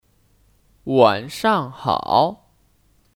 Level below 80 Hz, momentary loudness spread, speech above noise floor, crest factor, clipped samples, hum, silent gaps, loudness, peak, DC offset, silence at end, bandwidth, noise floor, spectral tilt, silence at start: -56 dBFS; 7 LU; 41 dB; 20 dB; under 0.1%; none; none; -19 LUFS; -2 dBFS; under 0.1%; 0.85 s; 17.5 kHz; -59 dBFS; -5.5 dB/octave; 0.85 s